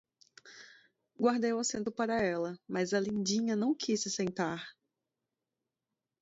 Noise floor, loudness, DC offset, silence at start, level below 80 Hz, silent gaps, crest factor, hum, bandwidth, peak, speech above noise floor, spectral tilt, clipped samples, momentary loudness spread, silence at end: -89 dBFS; -33 LUFS; under 0.1%; 0.45 s; -72 dBFS; none; 18 dB; none; 8 kHz; -16 dBFS; 57 dB; -4 dB/octave; under 0.1%; 18 LU; 1.5 s